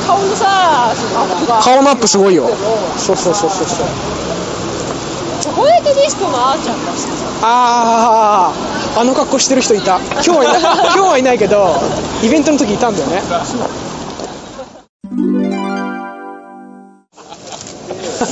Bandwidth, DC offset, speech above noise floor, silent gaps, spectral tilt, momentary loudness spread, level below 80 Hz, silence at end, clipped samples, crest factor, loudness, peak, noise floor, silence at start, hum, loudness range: 9.4 kHz; under 0.1%; 27 dB; 14.89-15.00 s; -3.5 dB/octave; 15 LU; -42 dBFS; 0 s; under 0.1%; 12 dB; -12 LUFS; -2 dBFS; -39 dBFS; 0 s; none; 10 LU